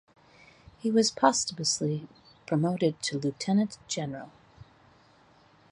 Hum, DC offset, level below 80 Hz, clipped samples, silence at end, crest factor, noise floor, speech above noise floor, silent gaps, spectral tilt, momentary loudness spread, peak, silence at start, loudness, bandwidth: none; under 0.1%; -66 dBFS; under 0.1%; 1.1 s; 22 dB; -60 dBFS; 32 dB; none; -4.5 dB/octave; 12 LU; -8 dBFS; 0.85 s; -28 LUFS; 11.5 kHz